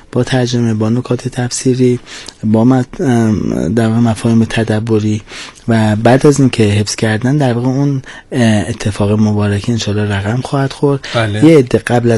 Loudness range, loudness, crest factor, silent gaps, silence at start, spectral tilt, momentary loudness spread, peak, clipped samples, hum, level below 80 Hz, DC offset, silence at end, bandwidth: 2 LU; -13 LUFS; 12 dB; none; 0.15 s; -6.5 dB/octave; 8 LU; 0 dBFS; 0.5%; none; -40 dBFS; under 0.1%; 0 s; 12 kHz